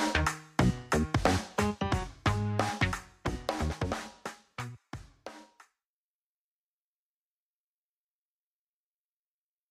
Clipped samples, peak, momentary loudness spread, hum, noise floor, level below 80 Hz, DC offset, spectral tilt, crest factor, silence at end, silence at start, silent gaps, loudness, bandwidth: under 0.1%; -10 dBFS; 17 LU; none; under -90 dBFS; -44 dBFS; under 0.1%; -5 dB/octave; 24 dB; 4.25 s; 0 s; none; -32 LUFS; 15.5 kHz